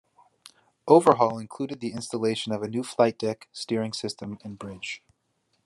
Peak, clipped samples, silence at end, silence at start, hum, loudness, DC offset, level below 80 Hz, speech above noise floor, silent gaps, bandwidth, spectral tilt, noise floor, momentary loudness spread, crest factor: -2 dBFS; under 0.1%; 0.7 s; 0.85 s; none; -26 LUFS; under 0.1%; -74 dBFS; 47 dB; none; 12.5 kHz; -5.5 dB/octave; -73 dBFS; 18 LU; 24 dB